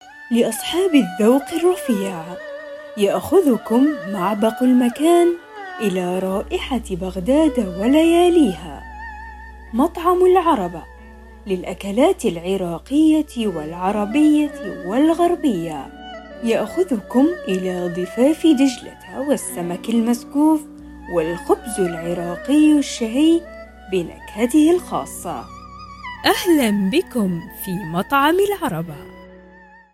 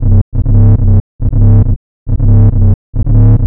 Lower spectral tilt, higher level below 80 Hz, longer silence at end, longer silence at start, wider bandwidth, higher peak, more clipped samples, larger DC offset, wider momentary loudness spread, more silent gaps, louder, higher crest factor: second, -5.5 dB/octave vs -16 dB/octave; second, -44 dBFS vs -12 dBFS; first, 0.55 s vs 0 s; about the same, 0.05 s vs 0 s; first, 16 kHz vs 1.8 kHz; about the same, -2 dBFS vs 0 dBFS; neither; neither; first, 17 LU vs 7 LU; second, none vs 0.21-0.32 s, 1.00-1.19 s, 1.76-2.06 s, 2.74-2.93 s; second, -18 LUFS vs -10 LUFS; first, 16 dB vs 6 dB